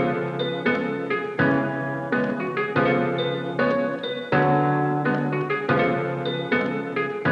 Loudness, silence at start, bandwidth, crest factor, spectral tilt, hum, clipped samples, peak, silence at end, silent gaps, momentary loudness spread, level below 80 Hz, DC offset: -23 LUFS; 0 s; 7.4 kHz; 16 dB; -8 dB/octave; none; under 0.1%; -8 dBFS; 0 s; none; 5 LU; -60 dBFS; under 0.1%